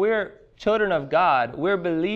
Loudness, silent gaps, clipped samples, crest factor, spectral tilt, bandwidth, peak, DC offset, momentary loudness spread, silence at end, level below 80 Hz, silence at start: -22 LUFS; none; under 0.1%; 14 dB; -7 dB/octave; 7.4 kHz; -8 dBFS; under 0.1%; 7 LU; 0 s; -54 dBFS; 0 s